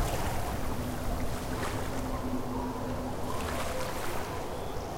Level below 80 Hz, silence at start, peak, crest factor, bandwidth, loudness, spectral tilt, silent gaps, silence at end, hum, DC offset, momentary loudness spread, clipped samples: -40 dBFS; 0 s; -18 dBFS; 14 dB; 16 kHz; -35 LUFS; -5 dB/octave; none; 0 s; none; under 0.1%; 2 LU; under 0.1%